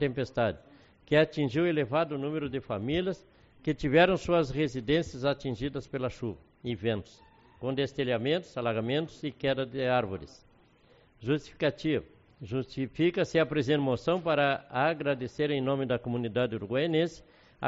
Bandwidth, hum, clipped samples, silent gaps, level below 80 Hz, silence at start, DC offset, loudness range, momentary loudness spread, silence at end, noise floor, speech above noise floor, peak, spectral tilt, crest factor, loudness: 7.6 kHz; none; under 0.1%; none; -56 dBFS; 0 s; under 0.1%; 5 LU; 10 LU; 0 s; -62 dBFS; 32 dB; -10 dBFS; -5 dB/octave; 20 dB; -30 LUFS